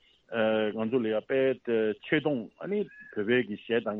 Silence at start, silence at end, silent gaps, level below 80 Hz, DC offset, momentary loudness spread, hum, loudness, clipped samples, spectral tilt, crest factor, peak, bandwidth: 0.3 s; 0 s; none; -72 dBFS; under 0.1%; 7 LU; none; -29 LUFS; under 0.1%; -4 dB/octave; 16 dB; -12 dBFS; 4.1 kHz